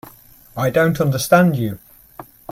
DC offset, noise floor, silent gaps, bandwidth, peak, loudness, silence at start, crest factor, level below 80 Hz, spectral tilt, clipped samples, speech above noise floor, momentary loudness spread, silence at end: under 0.1%; -45 dBFS; none; 16.5 kHz; 0 dBFS; -17 LUFS; 0.55 s; 18 dB; -50 dBFS; -6 dB/octave; under 0.1%; 29 dB; 21 LU; 0.3 s